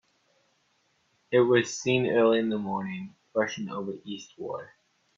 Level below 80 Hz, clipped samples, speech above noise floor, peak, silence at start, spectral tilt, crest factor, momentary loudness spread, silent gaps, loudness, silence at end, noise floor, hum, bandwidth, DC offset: -70 dBFS; under 0.1%; 44 dB; -8 dBFS; 1.3 s; -5 dB/octave; 20 dB; 16 LU; none; -27 LUFS; 0.5 s; -70 dBFS; none; 7.6 kHz; under 0.1%